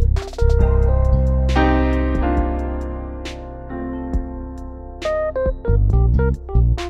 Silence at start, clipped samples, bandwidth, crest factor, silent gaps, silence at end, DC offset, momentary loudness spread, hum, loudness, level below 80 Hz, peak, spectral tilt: 0 s; under 0.1%; 7.6 kHz; 16 dB; none; 0 s; under 0.1%; 14 LU; none; -20 LUFS; -20 dBFS; -2 dBFS; -8 dB/octave